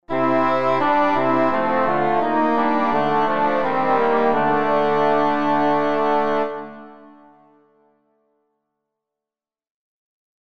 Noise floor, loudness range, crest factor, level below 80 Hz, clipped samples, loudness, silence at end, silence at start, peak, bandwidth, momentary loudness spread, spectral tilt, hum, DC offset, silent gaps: under -90 dBFS; 7 LU; 14 dB; -56 dBFS; under 0.1%; -19 LUFS; 0.4 s; 0 s; -6 dBFS; 7.6 kHz; 2 LU; -7 dB/octave; none; under 0.1%; none